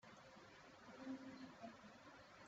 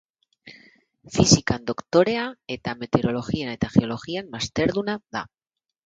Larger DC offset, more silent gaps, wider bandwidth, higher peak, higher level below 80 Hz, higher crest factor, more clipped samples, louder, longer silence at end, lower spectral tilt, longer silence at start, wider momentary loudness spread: neither; neither; second, 7.6 kHz vs 9.4 kHz; second, -42 dBFS vs -2 dBFS; second, -86 dBFS vs -48 dBFS; second, 18 dB vs 24 dB; neither; second, -58 LUFS vs -23 LUFS; second, 0 s vs 0.6 s; about the same, -3.5 dB/octave vs -4.5 dB/octave; second, 0 s vs 0.45 s; second, 9 LU vs 13 LU